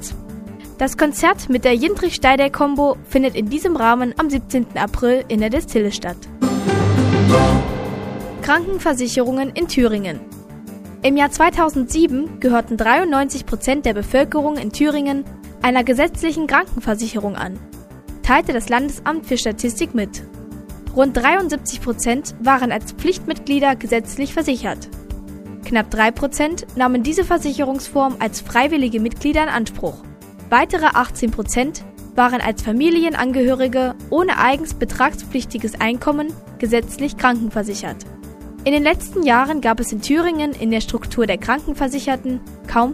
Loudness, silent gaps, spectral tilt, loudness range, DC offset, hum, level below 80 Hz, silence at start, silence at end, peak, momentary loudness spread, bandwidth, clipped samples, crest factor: -18 LUFS; none; -5 dB/octave; 3 LU; under 0.1%; none; -34 dBFS; 0 s; 0 s; 0 dBFS; 13 LU; 15.5 kHz; under 0.1%; 18 dB